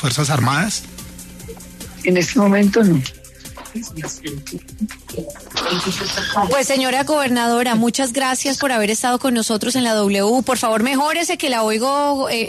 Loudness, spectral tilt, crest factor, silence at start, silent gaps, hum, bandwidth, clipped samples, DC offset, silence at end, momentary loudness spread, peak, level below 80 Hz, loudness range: -17 LUFS; -4 dB/octave; 14 dB; 0 s; none; none; 13.5 kHz; under 0.1%; under 0.1%; 0 s; 17 LU; -4 dBFS; -46 dBFS; 5 LU